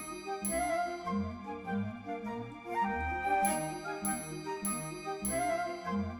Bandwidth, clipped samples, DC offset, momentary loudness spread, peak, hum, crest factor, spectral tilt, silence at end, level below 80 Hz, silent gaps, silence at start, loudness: over 20 kHz; under 0.1%; under 0.1%; 8 LU; -16 dBFS; none; 18 dB; -4.5 dB/octave; 0 s; -56 dBFS; none; 0 s; -35 LUFS